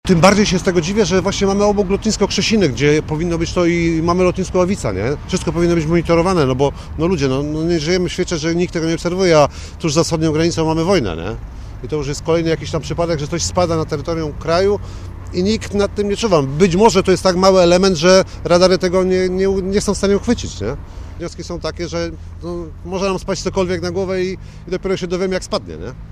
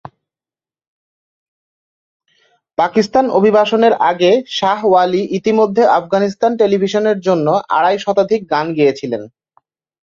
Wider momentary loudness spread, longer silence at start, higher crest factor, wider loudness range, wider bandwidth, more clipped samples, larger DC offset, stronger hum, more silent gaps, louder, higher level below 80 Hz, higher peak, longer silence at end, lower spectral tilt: first, 13 LU vs 5 LU; second, 0.05 s vs 2.8 s; about the same, 16 dB vs 14 dB; first, 8 LU vs 5 LU; first, 13.5 kHz vs 7.4 kHz; neither; neither; neither; neither; about the same, -16 LUFS vs -14 LUFS; first, -32 dBFS vs -60 dBFS; about the same, 0 dBFS vs -2 dBFS; second, 0 s vs 0.8 s; about the same, -5.5 dB/octave vs -6 dB/octave